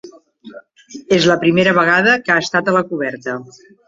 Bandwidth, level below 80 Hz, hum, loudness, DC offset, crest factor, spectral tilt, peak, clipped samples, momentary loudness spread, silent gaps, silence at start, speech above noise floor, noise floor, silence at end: 7.8 kHz; -56 dBFS; none; -14 LUFS; under 0.1%; 16 dB; -5 dB/octave; -2 dBFS; under 0.1%; 12 LU; none; 0.05 s; 24 dB; -40 dBFS; 0.4 s